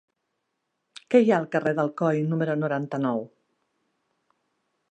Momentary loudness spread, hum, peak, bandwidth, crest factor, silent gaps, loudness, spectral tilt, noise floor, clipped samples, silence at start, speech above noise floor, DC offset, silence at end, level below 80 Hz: 8 LU; none; -6 dBFS; 9 kHz; 22 dB; none; -24 LUFS; -8 dB/octave; -79 dBFS; under 0.1%; 1.1 s; 55 dB; under 0.1%; 1.65 s; -78 dBFS